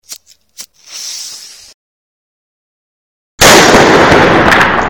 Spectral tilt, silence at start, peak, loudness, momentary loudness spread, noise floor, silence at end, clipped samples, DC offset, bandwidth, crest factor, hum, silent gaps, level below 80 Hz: -3 dB/octave; 0.1 s; 0 dBFS; -5 LUFS; 21 LU; -34 dBFS; 0 s; 2%; under 0.1%; over 20 kHz; 10 dB; none; 1.74-3.38 s; -32 dBFS